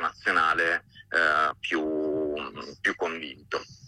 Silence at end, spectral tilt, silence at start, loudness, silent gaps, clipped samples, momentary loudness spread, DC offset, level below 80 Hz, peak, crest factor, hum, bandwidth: 0 s; -3.5 dB/octave; 0 s; -26 LUFS; none; under 0.1%; 12 LU; under 0.1%; -62 dBFS; -10 dBFS; 16 dB; none; 11.5 kHz